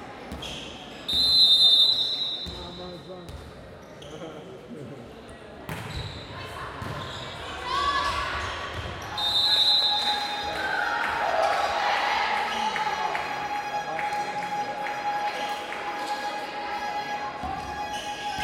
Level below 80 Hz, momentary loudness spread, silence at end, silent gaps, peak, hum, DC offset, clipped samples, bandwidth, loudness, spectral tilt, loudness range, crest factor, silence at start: -50 dBFS; 22 LU; 0 s; none; -6 dBFS; none; under 0.1%; under 0.1%; 16.5 kHz; -24 LUFS; -2 dB/octave; 17 LU; 20 dB; 0 s